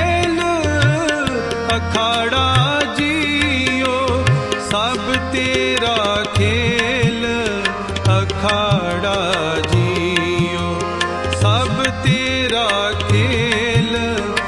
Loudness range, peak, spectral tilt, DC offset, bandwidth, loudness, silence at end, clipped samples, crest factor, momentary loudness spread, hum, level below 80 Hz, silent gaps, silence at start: 1 LU; 0 dBFS; -5 dB/octave; under 0.1%; 11.5 kHz; -17 LUFS; 0 s; under 0.1%; 16 dB; 4 LU; none; -38 dBFS; none; 0 s